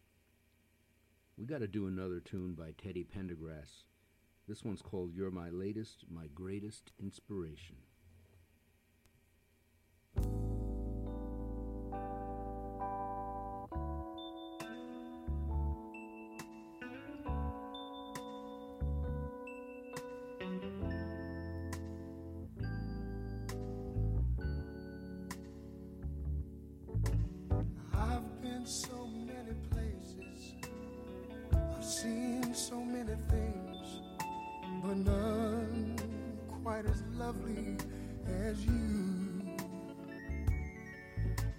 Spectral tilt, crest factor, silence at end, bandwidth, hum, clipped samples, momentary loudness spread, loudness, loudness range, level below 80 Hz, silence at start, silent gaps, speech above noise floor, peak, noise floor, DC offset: -6 dB/octave; 22 dB; 0 s; 16.5 kHz; none; under 0.1%; 12 LU; -41 LUFS; 7 LU; -44 dBFS; 1.35 s; none; 29 dB; -18 dBFS; -72 dBFS; under 0.1%